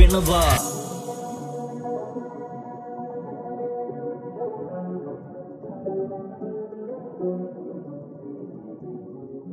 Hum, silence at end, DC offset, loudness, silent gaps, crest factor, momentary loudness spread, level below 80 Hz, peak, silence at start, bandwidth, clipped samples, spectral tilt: none; 0 s; under 0.1%; -29 LUFS; none; 26 dB; 16 LU; -30 dBFS; 0 dBFS; 0 s; 15 kHz; under 0.1%; -5 dB/octave